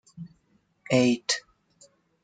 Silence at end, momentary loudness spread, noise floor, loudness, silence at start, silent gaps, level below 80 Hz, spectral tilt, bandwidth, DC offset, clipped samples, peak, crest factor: 0.85 s; 23 LU; -68 dBFS; -25 LUFS; 0.2 s; none; -68 dBFS; -4 dB/octave; 9.4 kHz; under 0.1%; under 0.1%; -8 dBFS; 22 dB